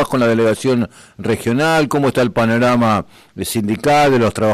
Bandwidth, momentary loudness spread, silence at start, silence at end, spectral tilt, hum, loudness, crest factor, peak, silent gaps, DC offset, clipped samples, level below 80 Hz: 14.5 kHz; 9 LU; 0 s; 0 s; -5.5 dB/octave; none; -15 LUFS; 10 dB; -6 dBFS; none; under 0.1%; under 0.1%; -46 dBFS